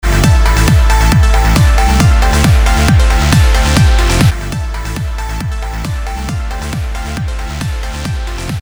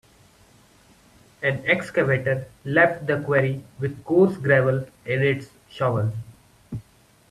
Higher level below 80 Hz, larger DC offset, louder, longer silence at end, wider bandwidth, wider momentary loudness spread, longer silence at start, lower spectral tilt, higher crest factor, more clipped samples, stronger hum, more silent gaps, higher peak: first, -12 dBFS vs -56 dBFS; neither; first, -12 LUFS vs -22 LUFS; second, 0 s vs 0.5 s; first, over 20 kHz vs 13 kHz; second, 10 LU vs 16 LU; second, 0.05 s vs 1.4 s; second, -5 dB/octave vs -7.5 dB/octave; second, 10 dB vs 20 dB; neither; neither; neither; first, 0 dBFS vs -4 dBFS